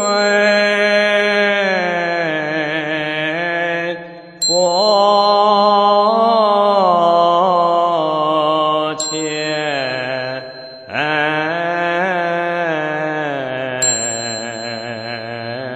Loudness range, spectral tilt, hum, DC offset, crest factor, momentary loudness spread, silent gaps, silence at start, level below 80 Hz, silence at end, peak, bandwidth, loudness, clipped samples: 6 LU; -3 dB/octave; none; under 0.1%; 14 dB; 12 LU; none; 0 s; -64 dBFS; 0 s; -2 dBFS; 11.5 kHz; -15 LUFS; under 0.1%